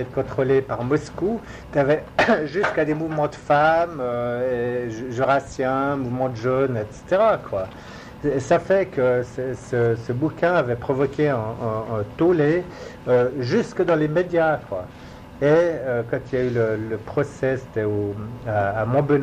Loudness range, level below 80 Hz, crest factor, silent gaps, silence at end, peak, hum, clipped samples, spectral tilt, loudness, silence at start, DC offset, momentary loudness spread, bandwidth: 2 LU; -48 dBFS; 14 dB; none; 0 s; -6 dBFS; none; under 0.1%; -7.5 dB/octave; -22 LUFS; 0 s; under 0.1%; 9 LU; 10.5 kHz